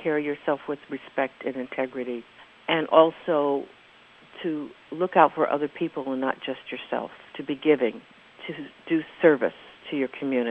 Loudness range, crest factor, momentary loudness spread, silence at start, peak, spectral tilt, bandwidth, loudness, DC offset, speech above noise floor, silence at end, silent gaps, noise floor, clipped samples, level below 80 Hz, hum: 4 LU; 24 dB; 17 LU; 0 s; -2 dBFS; -7.5 dB/octave; 5.2 kHz; -26 LUFS; under 0.1%; 28 dB; 0 s; none; -53 dBFS; under 0.1%; -72 dBFS; none